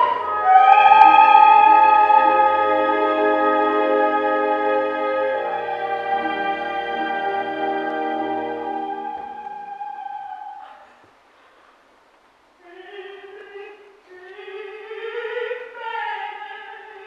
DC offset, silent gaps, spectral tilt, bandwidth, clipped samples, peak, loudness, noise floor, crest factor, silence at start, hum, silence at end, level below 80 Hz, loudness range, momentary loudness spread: under 0.1%; none; -5 dB/octave; 5.4 kHz; under 0.1%; 0 dBFS; -17 LUFS; -56 dBFS; 20 dB; 0 s; none; 0 s; -66 dBFS; 24 LU; 24 LU